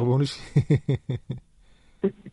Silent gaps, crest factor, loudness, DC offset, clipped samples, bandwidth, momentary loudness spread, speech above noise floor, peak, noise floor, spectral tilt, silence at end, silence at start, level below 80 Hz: none; 18 dB; -26 LUFS; under 0.1%; under 0.1%; 11 kHz; 13 LU; 31 dB; -8 dBFS; -56 dBFS; -8 dB/octave; 0.05 s; 0 s; -50 dBFS